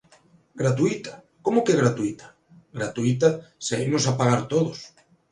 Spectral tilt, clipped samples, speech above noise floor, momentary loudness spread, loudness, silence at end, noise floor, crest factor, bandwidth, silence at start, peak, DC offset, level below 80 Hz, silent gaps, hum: -5.5 dB/octave; under 0.1%; 34 dB; 12 LU; -24 LUFS; 0.45 s; -57 dBFS; 20 dB; 11 kHz; 0.55 s; -4 dBFS; under 0.1%; -60 dBFS; none; none